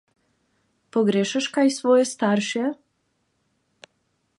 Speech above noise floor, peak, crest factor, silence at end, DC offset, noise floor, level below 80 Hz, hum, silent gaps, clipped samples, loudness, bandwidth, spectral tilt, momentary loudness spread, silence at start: 50 dB; -8 dBFS; 18 dB; 1.65 s; under 0.1%; -71 dBFS; -76 dBFS; none; none; under 0.1%; -22 LUFS; 11.5 kHz; -4.5 dB/octave; 9 LU; 0.95 s